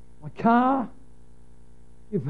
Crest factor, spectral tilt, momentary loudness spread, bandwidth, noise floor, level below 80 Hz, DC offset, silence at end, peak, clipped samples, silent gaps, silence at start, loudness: 20 dB; -9 dB/octave; 18 LU; 4.8 kHz; -53 dBFS; -56 dBFS; 0.9%; 0 s; -8 dBFS; under 0.1%; none; 0.25 s; -23 LUFS